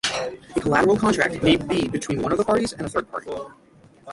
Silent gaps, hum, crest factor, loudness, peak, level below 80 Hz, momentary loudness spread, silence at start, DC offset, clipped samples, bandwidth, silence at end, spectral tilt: none; none; 20 dB; -22 LUFS; -4 dBFS; -48 dBFS; 13 LU; 0.05 s; under 0.1%; under 0.1%; 11.5 kHz; 0 s; -4.5 dB/octave